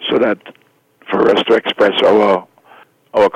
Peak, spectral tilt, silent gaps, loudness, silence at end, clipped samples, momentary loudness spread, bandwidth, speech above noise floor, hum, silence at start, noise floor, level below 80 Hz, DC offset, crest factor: -2 dBFS; -5.5 dB/octave; none; -14 LUFS; 0.05 s; under 0.1%; 9 LU; 9.4 kHz; 37 dB; none; 0 s; -50 dBFS; -56 dBFS; under 0.1%; 14 dB